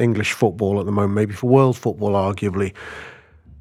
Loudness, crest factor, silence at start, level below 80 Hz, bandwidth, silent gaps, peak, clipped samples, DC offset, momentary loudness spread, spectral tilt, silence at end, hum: -19 LUFS; 18 dB; 0 s; -52 dBFS; 15 kHz; none; -2 dBFS; under 0.1%; under 0.1%; 19 LU; -7 dB/octave; 0.45 s; none